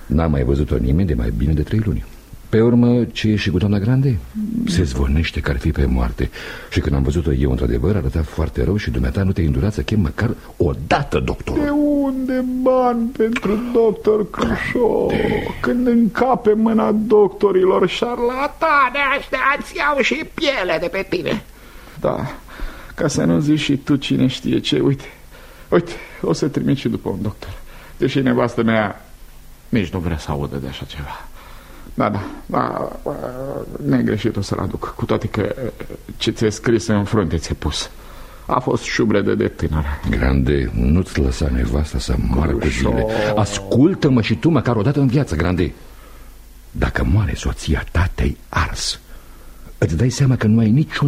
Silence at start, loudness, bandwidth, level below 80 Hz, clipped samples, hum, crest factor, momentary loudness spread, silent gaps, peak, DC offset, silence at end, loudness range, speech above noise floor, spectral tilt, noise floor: 0 s; -19 LUFS; 15.5 kHz; -28 dBFS; under 0.1%; none; 16 dB; 10 LU; none; -2 dBFS; under 0.1%; 0 s; 6 LU; 22 dB; -6.5 dB/octave; -39 dBFS